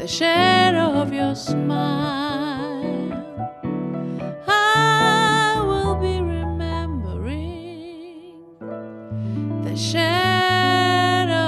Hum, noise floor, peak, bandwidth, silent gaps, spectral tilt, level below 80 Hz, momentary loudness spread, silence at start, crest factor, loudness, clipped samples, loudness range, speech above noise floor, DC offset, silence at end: none; -42 dBFS; -4 dBFS; 13 kHz; none; -5 dB/octave; -38 dBFS; 17 LU; 0 s; 16 dB; -20 LUFS; under 0.1%; 9 LU; 23 dB; under 0.1%; 0 s